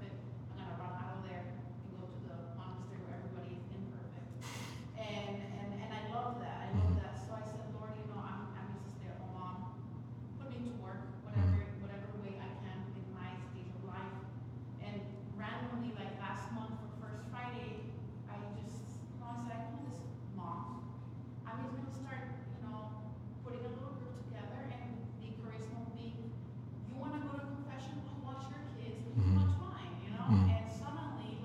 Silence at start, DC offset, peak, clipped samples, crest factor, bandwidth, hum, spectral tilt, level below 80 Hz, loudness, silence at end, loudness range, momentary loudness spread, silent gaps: 0 s; under 0.1%; -18 dBFS; under 0.1%; 24 dB; 8.8 kHz; none; -8 dB/octave; -60 dBFS; -43 LUFS; 0 s; 8 LU; 12 LU; none